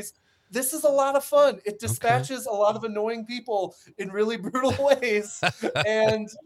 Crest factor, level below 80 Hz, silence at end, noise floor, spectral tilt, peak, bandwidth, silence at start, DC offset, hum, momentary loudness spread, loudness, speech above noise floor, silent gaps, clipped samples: 20 dB; -66 dBFS; 0.05 s; -45 dBFS; -4 dB/octave; -6 dBFS; 16.5 kHz; 0 s; under 0.1%; none; 10 LU; -24 LUFS; 21 dB; none; under 0.1%